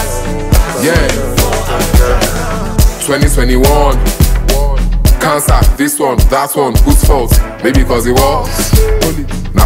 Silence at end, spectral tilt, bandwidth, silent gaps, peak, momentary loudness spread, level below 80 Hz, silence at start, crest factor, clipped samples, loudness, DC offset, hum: 0 s; -5 dB/octave; 16.5 kHz; none; 0 dBFS; 4 LU; -12 dBFS; 0 s; 8 dB; 1%; -11 LUFS; under 0.1%; none